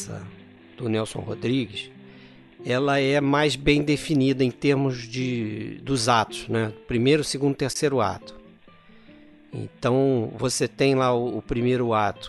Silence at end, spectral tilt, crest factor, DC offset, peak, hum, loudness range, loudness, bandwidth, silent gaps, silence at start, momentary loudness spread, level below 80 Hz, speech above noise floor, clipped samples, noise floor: 0 s; -5.5 dB/octave; 20 dB; under 0.1%; -4 dBFS; none; 4 LU; -24 LUFS; 12 kHz; none; 0 s; 13 LU; -48 dBFS; 27 dB; under 0.1%; -51 dBFS